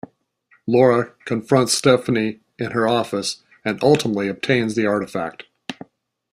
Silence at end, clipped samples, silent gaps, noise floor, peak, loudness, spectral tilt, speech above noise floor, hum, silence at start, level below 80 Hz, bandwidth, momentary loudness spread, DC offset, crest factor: 0.6 s; under 0.1%; none; -60 dBFS; -2 dBFS; -19 LUFS; -5 dB/octave; 41 dB; none; 0.65 s; -60 dBFS; 14 kHz; 17 LU; under 0.1%; 18 dB